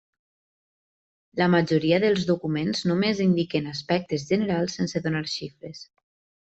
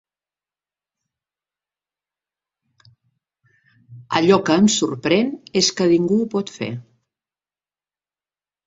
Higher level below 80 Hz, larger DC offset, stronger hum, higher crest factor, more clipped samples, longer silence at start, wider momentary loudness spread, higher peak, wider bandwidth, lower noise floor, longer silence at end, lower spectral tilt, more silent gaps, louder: about the same, -62 dBFS vs -62 dBFS; neither; second, none vs 50 Hz at -45 dBFS; about the same, 18 dB vs 22 dB; neither; second, 1.35 s vs 3.9 s; about the same, 12 LU vs 13 LU; second, -8 dBFS vs -2 dBFS; about the same, 8.2 kHz vs 8 kHz; about the same, under -90 dBFS vs under -90 dBFS; second, 0.65 s vs 1.85 s; first, -6 dB/octave vs -4.5 dB/octave; neither; second, -24 LUFS vs -18 LUFS